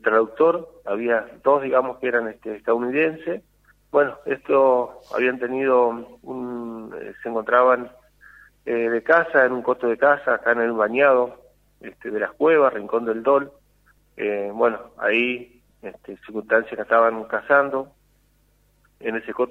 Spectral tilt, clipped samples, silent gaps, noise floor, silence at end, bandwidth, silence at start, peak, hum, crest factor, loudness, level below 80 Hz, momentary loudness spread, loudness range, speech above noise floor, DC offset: -7 dB/octave; under 0.1%; none; -61 dBFS; 0.05 s; 5.8 kHz; 0.05 s; -2 dBFS; 50 Hz at -60 dBFS; 20 dB; -21 LUFS; -62 dBFS; 16 LU; 4 LU; 40 dB; under 0.1%